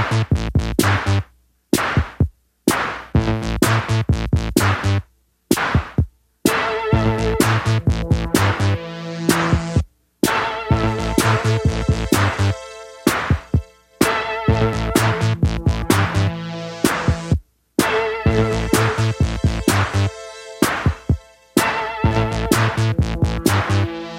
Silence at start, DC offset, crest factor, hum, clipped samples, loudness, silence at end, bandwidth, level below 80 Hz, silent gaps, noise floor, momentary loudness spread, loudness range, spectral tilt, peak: 0 s; under 0.1%; 18 dB; none; under 0.1%; -19 LUFS; 0 s; 16.5 kHz; -30 dBFS; none; -53 dBFS; 6 LU; 1 LU; -5.5 dB/octave; 0 dBFS